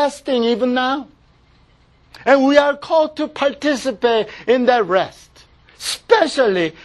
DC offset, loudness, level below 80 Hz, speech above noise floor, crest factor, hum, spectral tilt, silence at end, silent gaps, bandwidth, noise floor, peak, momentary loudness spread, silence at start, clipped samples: under 0.1%; -17 LUFS; -54 dBFS; 36 dB; 18 dB; none; -4 dB/octave; 0.15 s; none; 12.5 kHz; -53 dBFS; 0 dBFS; 10 LU; 0 s; under 0.1%